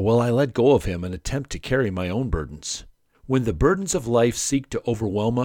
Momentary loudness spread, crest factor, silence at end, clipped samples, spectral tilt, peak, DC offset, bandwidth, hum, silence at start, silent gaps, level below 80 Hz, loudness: 10 LU; 18 dB; 0 s; under 0.1%; -5.5 dB/octave; -4 dBFS; under 0.1%; 17.5 kHz; none; 0 s; none; -38 dBFS; -23 LUFS